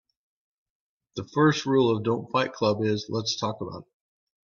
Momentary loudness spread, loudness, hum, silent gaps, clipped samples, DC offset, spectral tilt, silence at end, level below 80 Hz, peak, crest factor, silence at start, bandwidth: 15 LU; -25 LUFS; none; none; under 0.1%; under 0.1%; -5.5 dB/octave; 0.6 s; -66 dBFS; -8 dBFS; 20 dB; 1.15 s; 7.4 kHz